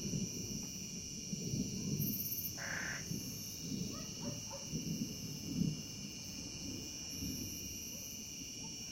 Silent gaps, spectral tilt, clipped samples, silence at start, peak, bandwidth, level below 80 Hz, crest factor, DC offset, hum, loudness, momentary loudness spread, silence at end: none; -3.5 dB/octave; under 0.1%; 0 s; -24 dBFS; 16.5 kHz; -60 dBFS; 18 dB; under 0.1%; none; -41 LUFS; 6 LU; 0 s